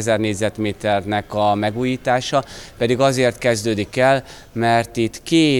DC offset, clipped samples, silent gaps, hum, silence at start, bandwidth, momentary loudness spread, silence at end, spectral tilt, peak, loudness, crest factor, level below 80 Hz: under 0.1%; under 0.1%; none; none; 0 s; 18.5 kHz; 6 LU; 0 s; -5 dB/octave; -4 dBFS; -19 LUFS; 16 dB; -48 dBFS